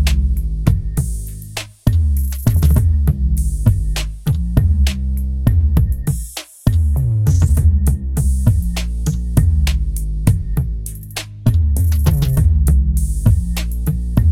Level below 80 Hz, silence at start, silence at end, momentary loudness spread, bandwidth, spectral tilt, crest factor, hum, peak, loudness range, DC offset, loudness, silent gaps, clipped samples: -18 dBFS; 0 s; 0 s; 8 LU; 16 kHz; -6.5 dB/octave; 14 dB; none; 0 dBFS; 2 LU; under 0.1%; -17 LUFS; none; under 0.1%